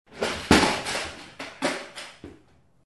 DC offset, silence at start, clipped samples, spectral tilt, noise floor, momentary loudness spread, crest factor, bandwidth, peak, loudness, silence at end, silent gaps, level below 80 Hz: under 0.1%; 0.1 s; under 0.1%; -3.5 dB/octave; -59 dBFS; 20 LU; 26 dB; 12.5 kHz; -2 dBFS; -25 LUFS; 0.6 s; none; -44 dBFS